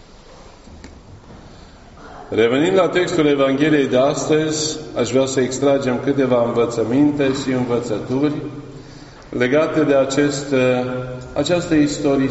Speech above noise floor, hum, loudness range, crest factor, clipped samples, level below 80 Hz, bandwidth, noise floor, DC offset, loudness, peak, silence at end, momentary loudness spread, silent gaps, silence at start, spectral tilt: 25 dB; none; 3 LU; 16 dB; under 0.1%; -46 dBFS; 8.2 kHz; -42 dBFS; under 0.1%; -18 LUFS; -4 dBFS; 0 s; 9 LU; none; 0.3 s; -5 dB/octave